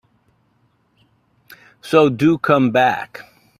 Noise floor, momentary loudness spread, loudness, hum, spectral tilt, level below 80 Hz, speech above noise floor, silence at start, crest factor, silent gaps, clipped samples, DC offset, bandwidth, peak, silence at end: -62 dBFS; 22 LU; -16 LUFS; none; -7 dB/octave; -58 dBFS; 46 dB; 1.85 s; 20 dB; none; under 0.1%; under 0.1%; 14.5 kHz; 0 dBFS; 0.4 s